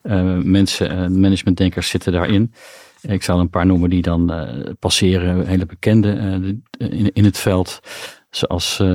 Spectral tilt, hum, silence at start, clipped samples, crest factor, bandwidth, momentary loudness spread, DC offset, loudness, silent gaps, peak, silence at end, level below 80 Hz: -6 dB/octave; none; 0.05 s; under 0.1%; 14 dB; 15.5 kHz; 11 LU; under 0.1%; -17 LUFS; none; -2 dBFS; 0 s; -38 dBFS